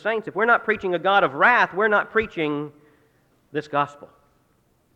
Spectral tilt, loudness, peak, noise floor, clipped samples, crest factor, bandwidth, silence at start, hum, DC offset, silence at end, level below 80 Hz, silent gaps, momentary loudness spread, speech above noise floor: -6 dB/octave; -21 LUFS; -4 dBFS; -64 dBFS; under 0.1%; 18 dB; 8.6 kHz; 0.05 s; none; under 0.1%; 0.9 s; -60 dBFS; none; 14 LU; 42 dB